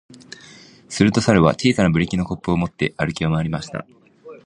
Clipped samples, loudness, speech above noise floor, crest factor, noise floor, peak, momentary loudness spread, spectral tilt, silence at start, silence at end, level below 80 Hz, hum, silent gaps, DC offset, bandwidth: under 0.1%; -19 LUFS; 27 dB; 20 dB; -45 dBFS; 0 dBFS; 21 LU; -6 dB/octave; 0.9 s; 0.1 s; -42 dBFS; none; none; under 0.1%; 10.5 kHz